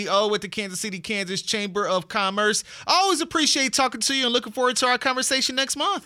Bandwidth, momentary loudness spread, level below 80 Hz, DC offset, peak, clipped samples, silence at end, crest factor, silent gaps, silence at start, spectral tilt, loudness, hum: 18 kHz; 7 LU; -64 dBFS; under 0.1%; -6 dBFS; under 0.1%; 0.05 s; 18 dB; none; 0 s; -1.5 dB/octave; -22 LUFS; none